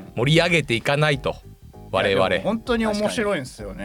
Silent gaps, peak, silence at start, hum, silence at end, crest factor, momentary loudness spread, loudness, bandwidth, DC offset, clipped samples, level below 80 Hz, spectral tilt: none; -6 dBFS; 0 s; none; 0 s; 16 dB; 10 LU; -21 LUFS; 16.5 kHz; under 0.1%; under 0.1%; -44 dBFS; -5 dB/octave